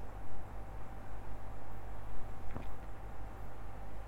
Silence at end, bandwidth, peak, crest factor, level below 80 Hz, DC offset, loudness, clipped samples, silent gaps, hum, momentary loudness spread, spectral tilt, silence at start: 0 s; 13.5 kHz; -22 dBFS; 12 dB; -48 dBFS; under 0.1%; -50 LUFS; under 0.1%; none; none; 3 LU; -7 dB/octave; 0 s